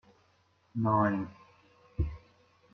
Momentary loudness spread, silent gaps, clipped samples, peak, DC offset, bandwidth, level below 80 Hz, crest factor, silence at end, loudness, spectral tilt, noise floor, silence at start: 18 LU; none; under 0.1%; -12 dBFS; under 0.1%; 6.2 kHz; -48 dBFS; 22 dB; 0.55 s; -32 LUFS; -10 dB/octave; -69 dBFS; 0.75 s